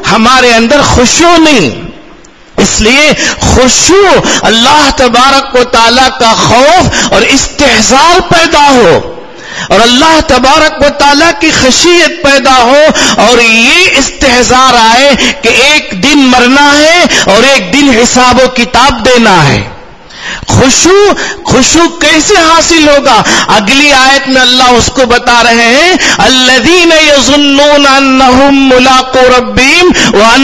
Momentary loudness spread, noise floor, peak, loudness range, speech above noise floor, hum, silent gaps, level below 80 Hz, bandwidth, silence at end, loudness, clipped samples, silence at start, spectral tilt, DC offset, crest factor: 4 LU; -33 dBFS; 0 dBFS; 2 LU; 29 dB; none; none; -26 dBFS; 12 kHz; 0 s; -3 LUFS; 10%; 0 s; -2.5 dB/octave; 3%; 4 dB